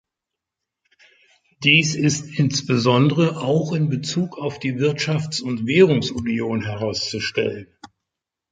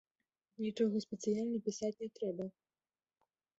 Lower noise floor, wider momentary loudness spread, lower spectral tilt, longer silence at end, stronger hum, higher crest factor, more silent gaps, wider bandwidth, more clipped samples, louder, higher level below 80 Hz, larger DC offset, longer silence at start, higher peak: second, -85 dBFS vs under -90 dBFS; first, 10 LU vs 7 LU; second, -5 dB/octave vs -7 dB/octave; second, 0.65 s vs 1.1 s; neither; about the same, 20 dB vs 18 dB; neither; first, 9.4 kHz vs 8 kHz; neither; first, -20 LUFS vs -39 LUFS; first, -54 dBFS vs -82 dBFS; neither; first, 1.6 s vs 0.6 s; first, -2 dBFS vs -22 dBFS